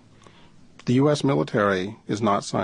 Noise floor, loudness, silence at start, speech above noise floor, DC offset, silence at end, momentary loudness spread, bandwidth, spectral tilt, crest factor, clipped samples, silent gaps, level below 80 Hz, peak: -50 dBFS; -23 LUFS; 0.85 s; 28 dB; under 0.1%; 0 s; 8 LU; 10.5 kHz; -6 dB/octave; 16 dB; under 0.1%; none; -58 dBFS; -6 dBFS